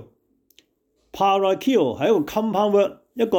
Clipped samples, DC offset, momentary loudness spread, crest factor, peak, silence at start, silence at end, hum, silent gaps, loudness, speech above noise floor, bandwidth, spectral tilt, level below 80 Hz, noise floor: under 0.1%; under 0.1%; 6 LU; 14 dB; -8 dBFS; 0 s; 0 s; none; none; -21 LUFS; 48 dB; 19 kHz; -6 dB/octave; -60 dBFS; -68 dBFS